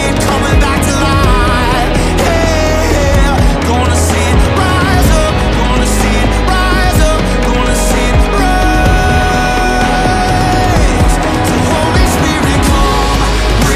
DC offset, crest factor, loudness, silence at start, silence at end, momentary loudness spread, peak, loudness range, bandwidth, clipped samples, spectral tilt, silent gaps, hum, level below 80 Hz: under 0.1%; 10 dB; -11 LUFS; 0 s; 0 s; 2 LU; 0 dBFS; 0 LU; 15.5 kHz; under 0.1%; -5 dB/octave; none; none; -14 dBFS